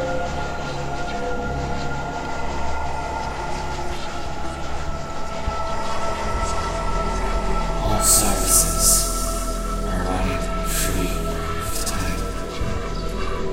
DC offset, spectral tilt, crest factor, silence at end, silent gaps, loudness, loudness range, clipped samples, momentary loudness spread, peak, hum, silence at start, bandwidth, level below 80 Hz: under 0.1%; -3 dB/octave; 22 dB; 0 s; none; -23 LUFS; 9 LU; under 0.1%; 13 LU; 0 dBFS; none; 0 s; 16 kHz; -28 dBFS